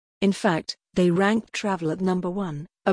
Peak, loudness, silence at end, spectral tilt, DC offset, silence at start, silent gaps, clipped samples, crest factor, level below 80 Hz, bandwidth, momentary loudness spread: -6 dBFS; -25 LUFS; 0 s; -6 dB/octave; under 0.1%; 0.2 s; none; under 0.1%; 18 dB; -56 dBFS; 10.5 kHz; 8 LU